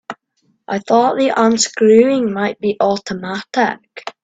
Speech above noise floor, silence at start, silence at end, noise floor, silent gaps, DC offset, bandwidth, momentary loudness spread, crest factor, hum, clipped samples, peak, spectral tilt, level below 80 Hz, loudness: 48 dB; 0.1 s; 0.15 s; -63 dBFS; none; under 0.1%; 9 kHz; 16 LU; 16 dB; none; under 0.1%; 0 dBFS; -4 dB/octave; -60 dBFS; -15 LUFS